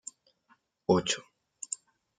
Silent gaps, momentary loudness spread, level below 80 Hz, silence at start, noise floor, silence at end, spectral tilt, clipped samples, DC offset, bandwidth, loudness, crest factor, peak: none; 17 LU; -68 dBFS; 0.9 s; -69 dBFS; 0.45 s; -4 dB/octave; under 0.1%; under 0.1%; 9.6 kHz; -31 LUFS; 24 dB; -12 dBFS